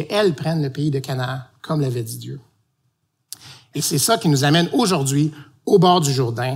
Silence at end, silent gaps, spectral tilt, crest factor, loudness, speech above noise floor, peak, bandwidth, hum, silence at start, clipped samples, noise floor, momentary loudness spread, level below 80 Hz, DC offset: 0 s; none; -5 dB/octave; 16 dB; -19 LUFS; 50 dB; -4 dBFS; 16 kHz; none; 0 s; under 0.1%; -69 dBFS; 18 LU; -62 dBFS; under 0.1%